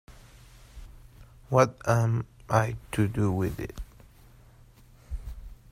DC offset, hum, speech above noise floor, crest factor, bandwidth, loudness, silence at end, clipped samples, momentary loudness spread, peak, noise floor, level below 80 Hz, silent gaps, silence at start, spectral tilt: under 0.1%; none; 29 dB; 22 dB; 15.5 kHz; -27 LUFS; 0.15 s; under 0.1%; 21 LU; -8 dBFS; -54 dBFS; -46 dBFS; none; 0.1 s; -7 dB/octave